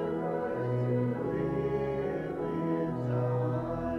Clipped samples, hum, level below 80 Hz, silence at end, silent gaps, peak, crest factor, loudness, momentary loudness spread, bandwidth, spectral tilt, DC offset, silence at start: under 0.1%; none; -54 dBFS; 0 s; none; -20 dBFS; 12 dB; -32 LUFS; 3 LU; 6 kHz; -10 dB/octave; under 0.1%; 0 s